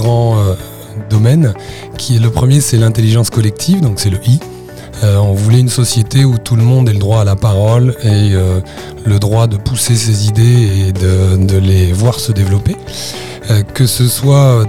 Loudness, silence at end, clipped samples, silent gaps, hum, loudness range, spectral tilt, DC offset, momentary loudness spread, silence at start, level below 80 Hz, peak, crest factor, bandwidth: -11 LUFS; 0 s; 0.2%; none; none; 2 LU; -6 dB/octave; 1%; 11 LU; 0 s; -34 dBFS; 0 dBFS; 10 dB; 16 kHz